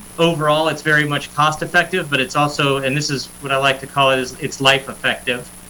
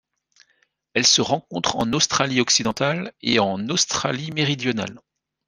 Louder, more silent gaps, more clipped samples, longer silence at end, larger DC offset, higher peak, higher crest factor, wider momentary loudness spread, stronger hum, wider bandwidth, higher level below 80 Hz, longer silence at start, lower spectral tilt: first, -17 LUFS vs -20 LUFS; neither; neither; second, 0 s vs 0.5 s; neither; about the same, -2 dBFS vs -2 dBFS; second, 16 dB vs 22 dB; second, 6 LU vs 9 LU; neither; first, 19 kHz vs 10.5 kHz; first, -48 dBFS vs -58 dBFS; second, 0 s vs 0.95 s; first, -4 dB/octave vs -2.5 dB/octave